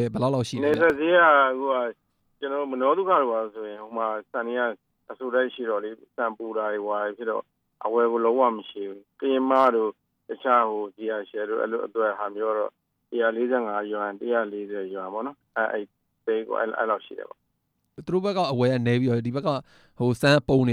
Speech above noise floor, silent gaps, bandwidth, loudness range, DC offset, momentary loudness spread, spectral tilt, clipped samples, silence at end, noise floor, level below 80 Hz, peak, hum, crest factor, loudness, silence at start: 50 dB; none; 13.5 kHz; 6 LU; under 0.1%; 14 LU; -6.5 dB/octave; under 0.1%; 0 s; -75 dBFS; -62 dBFS; -6 dBFS; none; 18 dB; -25 LUFS; 0 s